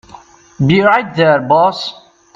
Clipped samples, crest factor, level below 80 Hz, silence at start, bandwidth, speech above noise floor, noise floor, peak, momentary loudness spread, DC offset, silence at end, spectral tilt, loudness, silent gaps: under 0.1%; 14 dB; -50 dBFS; 0.6 s; 7.6 kHz; 28 dB; -40 dBFS; 0 dBFS; 10 LU; under 0.1%; 0.45 s; -7 dB/octave; -12 LUFS; none